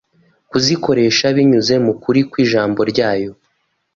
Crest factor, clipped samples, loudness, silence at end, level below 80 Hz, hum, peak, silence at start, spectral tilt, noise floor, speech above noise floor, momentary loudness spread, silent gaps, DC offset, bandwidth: 14 dB; under 0.1%; -15 LUFS; 0.6 s; -52 dBFS; none; -2 dBFS; 0.55 s; -5 dB/octave; -66 dBFS; 52 dB; 6 LU; none; under 0.1%; 7.4 kHz